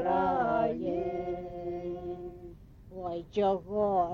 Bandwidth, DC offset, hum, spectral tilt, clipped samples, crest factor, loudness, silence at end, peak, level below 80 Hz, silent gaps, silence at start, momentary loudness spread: 7 kHz; under 0.1%; none; -8 dB/octave; under 0.1%; 14 dB; -32 LUFS; 0 s; -18 dBFS; -54 dBFS; none; 0 s; 15 LU